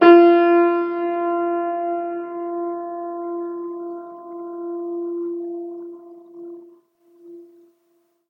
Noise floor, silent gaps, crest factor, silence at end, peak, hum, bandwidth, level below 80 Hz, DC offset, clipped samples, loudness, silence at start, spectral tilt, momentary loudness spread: -65 dBFS; none; 20 dB; 0.85 s; 0 dBFS; none; 4.9 kHz; -82 dBFS; under 0.1%; under 0.1%; -21 LUFS; 0 s; -7 dB/octave; 23 LU